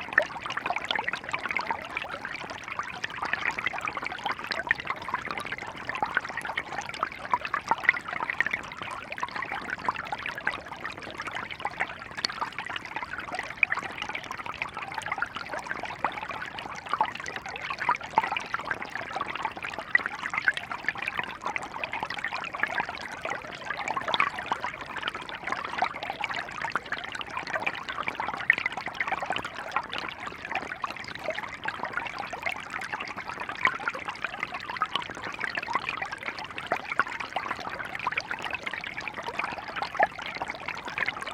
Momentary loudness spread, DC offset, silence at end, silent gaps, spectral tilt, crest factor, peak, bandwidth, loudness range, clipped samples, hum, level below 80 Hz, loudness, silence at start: 8 LU; under 0.1%; 0 s; none; -3 dB/octave; 30 dB; -4 dBFS; 18 kHz; 3 LU; under 0.1%; none; -62 dBFS; -31 LUFS; 0 s